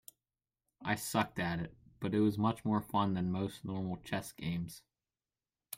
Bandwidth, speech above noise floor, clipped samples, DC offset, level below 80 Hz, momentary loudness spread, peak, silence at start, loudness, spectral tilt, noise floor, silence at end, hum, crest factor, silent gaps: 16 kHz; over 55 dB; under 0.1%; under 0.1%; -64 dBFS; 10 LU; -16 dBFS; 0.8 s; -36 LUFS; -6 dB/octave; under -90 dBFS; 0 s; none; 20 dB; none